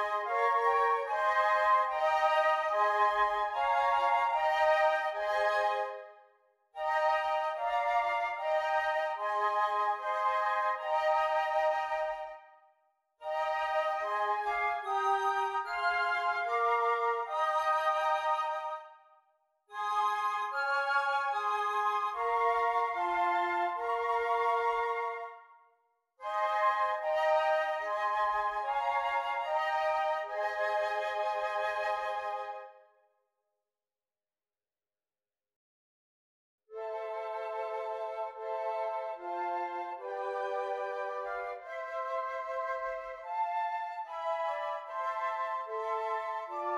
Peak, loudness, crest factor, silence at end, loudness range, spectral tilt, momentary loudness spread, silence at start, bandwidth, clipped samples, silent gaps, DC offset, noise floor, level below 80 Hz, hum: -16 dBFS; -31 LUFS; 16 dB; 0 s; 9 LU; -1.5 dB/octave; 10 LU; 0 s; 12.5 kHz; under 0.1%; 35.56-36.58 s; under 0.1%; under -90 dBFS; -70 dBFS; none